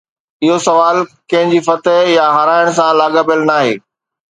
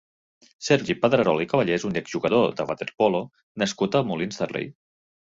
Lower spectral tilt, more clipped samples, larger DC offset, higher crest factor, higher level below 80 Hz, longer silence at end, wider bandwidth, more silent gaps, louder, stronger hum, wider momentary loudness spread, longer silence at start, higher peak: about the same, -4.5 dB/octave vs -5.5 dB/octave; neither; neither; second, 12 dB vs 20 dB; about the same, -62 dBFS vs -60 dBFS; about the same, 0.55 s vs 0.5 s; first, 10 kHz vs 8 kHz; second, none vs 3.43-3.55 s; first, -12 LUFS vs -24 LUFS; neither; second, 6 LU vs 9 LU; second, 0.4 s vs 0.6 s; first, 0 dBFS vs -4 dBFS